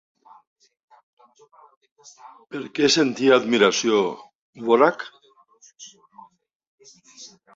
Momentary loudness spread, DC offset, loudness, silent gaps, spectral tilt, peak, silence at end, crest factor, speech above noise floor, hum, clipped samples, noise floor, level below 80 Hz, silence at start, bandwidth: 26 LU; under 0.1%; -19 LUFS; 4.35-4.53 s, 6.55-6.60 s, 6.67-6.78 s; -3.5 dB/octave; -4 dBFS; 0.3 s; 22 dB; 34 dB; none; under 0.1%; -55 dBFS; -68 dBFS; 2.25 s; 7.8 kHz